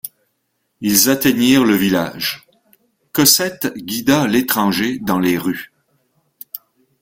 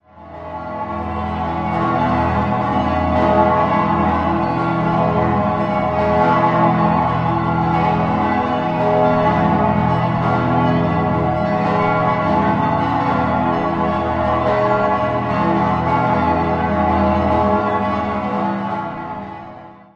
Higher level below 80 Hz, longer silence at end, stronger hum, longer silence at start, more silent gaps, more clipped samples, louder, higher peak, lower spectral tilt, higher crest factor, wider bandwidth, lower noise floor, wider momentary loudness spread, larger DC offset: second, -54 dBFS vs -34 dBFS; first, 0.45 s vs 0.2 s; neither; about the same, 0.05 s vs 0.15 s; neither; neither; about the same, -15 LUFS vs -17 LUFS; about the same, 0 dBFS vs 0 dBFS; second, -3.5 dB/octave vs -8.5 dB/octave; about the same, 18 dB vs 16 dB; first, 17 kHz vs 7.6 kHz; first, -69 dBFS vs -37 dBFS; first, 20 LU vs 7 LU; neither